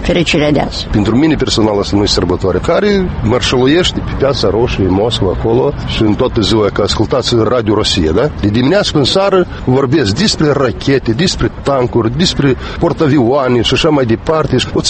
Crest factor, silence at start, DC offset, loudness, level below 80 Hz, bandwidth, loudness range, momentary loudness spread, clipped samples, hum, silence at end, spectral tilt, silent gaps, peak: 12 dB; 0 s; under 0.1%; -12 LUFS; -26 dBFS; 8.8 kHz; 1 LU; 3 LU; under 0.1%; none; 0 s; -5.5 dB/octave; none; 0 dBFS